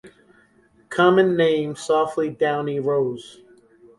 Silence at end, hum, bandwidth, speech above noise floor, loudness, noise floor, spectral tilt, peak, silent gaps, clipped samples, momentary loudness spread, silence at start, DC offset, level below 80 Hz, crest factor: 0.65 s; none; 11.5 kHz; 37 dB; -21 LUFS; -57 dBFS; -6 dB/octave; -4 dBFS; none; under 0.1%; 9 LU; 0.05 s; under 0.1%; -64 dBFS; 18 dB